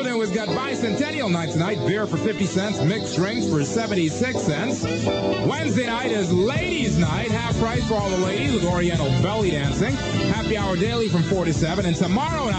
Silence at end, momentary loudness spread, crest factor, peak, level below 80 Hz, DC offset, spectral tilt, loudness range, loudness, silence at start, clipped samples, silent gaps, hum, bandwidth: 0 s; 2 LU; 14 dB; -8 dBFS; -40 dBFS; under 0.1%; -5.5 dB/octave; 1 LU; -22 LUFS; 0 s; under 0.1%; none; none; 9 kHz